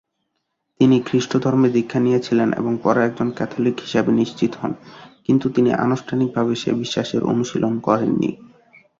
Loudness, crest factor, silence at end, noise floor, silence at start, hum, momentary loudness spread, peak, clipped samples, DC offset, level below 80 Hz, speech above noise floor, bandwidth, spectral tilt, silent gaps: -19 LUFS; 18 dB; 0.65 s; -74 dBFS; 0.8 s; none; 6 LU; -2 dBFS; under 0.1%; under 0.1%; -58 dBFS; 56 dB; 7.6 kHz; -6.5 dB/octave; none